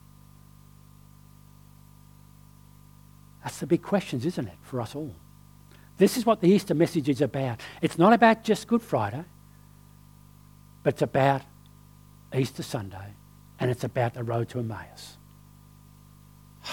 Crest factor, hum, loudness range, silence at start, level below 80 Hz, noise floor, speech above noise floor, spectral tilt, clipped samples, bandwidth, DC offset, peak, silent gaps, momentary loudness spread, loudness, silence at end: 24 dB; 50 Hz at -50 dBFS; 10 LU; 3.45 s; -60 dBFS; -52 dBFS; 27 dB; -6.5 dB/octave; under 0.1%; 19 kHz; under 0.1%; -4 dBFS; none; 19 LU; -26 LUFS; 0 s